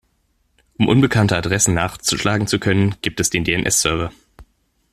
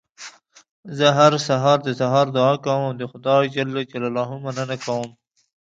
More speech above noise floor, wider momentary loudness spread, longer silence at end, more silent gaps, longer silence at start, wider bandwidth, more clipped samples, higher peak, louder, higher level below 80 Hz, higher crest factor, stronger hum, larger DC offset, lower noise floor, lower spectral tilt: first, 47 dB vs 23 dB; second, 5 LU vs 14 LU; about the same, 0.5 s vs 0.6 s; second, none vs 0.71-0.83 s; first, 0.8 s vs 0.2 s; first, 15.5 kHz vs 8.8 kHz; neither; about the same, 0 dBFS vs 0 dBFS; first, -17 LUFS vs -20 LUFS; first, -42 dBFS vs -68 dBFS; about the same, 18 dB vs 20 dB; neither; neither; first, -64 dBFS vs -43 dBFS; second, -4 dB/octave vs -5.5 dB/octave